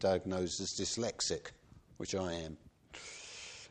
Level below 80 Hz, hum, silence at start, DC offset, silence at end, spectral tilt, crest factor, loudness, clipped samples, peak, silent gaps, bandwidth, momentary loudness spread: -62 dBFS; none; 0 s; under 0.1%; 0 s; -3.5 dB/octave; 20 dB; -38 LUFS; under 0.1%; -20 dBFS; none; 10 kHz; 15 LU